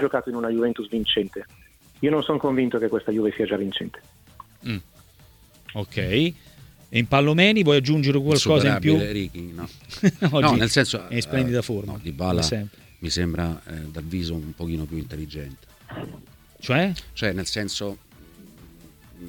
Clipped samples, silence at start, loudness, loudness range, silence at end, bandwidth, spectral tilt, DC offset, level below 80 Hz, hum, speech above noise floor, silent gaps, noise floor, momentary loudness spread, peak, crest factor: under 0.1%; 0 s; -23 LUFS; 10 LU; 0 s; 19 kHz; -5.5 dB/octave; under 0.1%; -46 dBFS; none; 29 dB; none; -52 dBFS; 18 LU; 0 dBFS; 24 dB